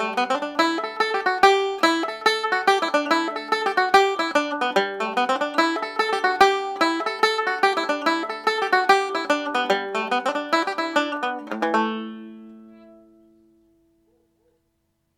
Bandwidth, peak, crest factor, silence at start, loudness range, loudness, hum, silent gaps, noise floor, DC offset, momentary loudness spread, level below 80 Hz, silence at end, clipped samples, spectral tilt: 16.5 kHz; -2 dBFS; 20 dB; 0 s; 7 LU; -21 LUFS; none; none; -71 dBFS; under 0.1%; 6 LU; -66 dBFS; 2.4 s; under 0.1%; -2.5 dB/octave